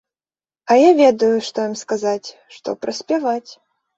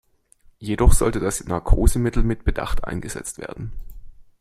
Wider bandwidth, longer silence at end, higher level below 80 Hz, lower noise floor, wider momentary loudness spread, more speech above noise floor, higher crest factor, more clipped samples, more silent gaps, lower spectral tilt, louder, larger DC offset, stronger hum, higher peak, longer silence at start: second, 8.2 kHz vs 13.5 kHz; first, 0.45 s vs 0.2 s; second, -66 dBFS vs -24 dBFS; first, under -90 dBFS vs -54 dBFS; about the same, 16 LU vs 16 LU; first, over 73 dB vs 35 dB; about the same, 16 dB vs 18 dB; neither; neither; about the same, -4.5 dB/octave vs -5.5 dB/octave; first, -17 LUFS vs -23 LUFS; neither; neither; about the same, -2 dBFS vs -2 dBFS; about the same, 0.65 s vs 0.6 s